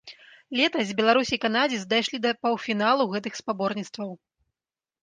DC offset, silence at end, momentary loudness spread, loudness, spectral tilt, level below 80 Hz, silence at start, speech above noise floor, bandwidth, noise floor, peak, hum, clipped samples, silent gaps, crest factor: under 0.1%; 0.9 s; 10 LU; -25 LUFS; -4 dB/octave; -68 dBFS; 0.05 s; over 65 dB; 9.8 kHz; under -90 dBFS; -6 dBFS; none; under 0.1%; none; 20 dB